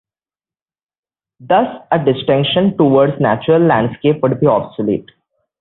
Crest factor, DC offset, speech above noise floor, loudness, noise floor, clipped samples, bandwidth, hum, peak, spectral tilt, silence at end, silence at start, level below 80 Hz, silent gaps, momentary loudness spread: 14 dB; under 0.1%; over 77 dB; -14 LUFS; under -90 dBFS; under 0.1%; 4.2 kHz; none; 0 dBFS; -12 dB/octave; 0.6 s; 1.4 s; -52 dBFS; none; 6 LU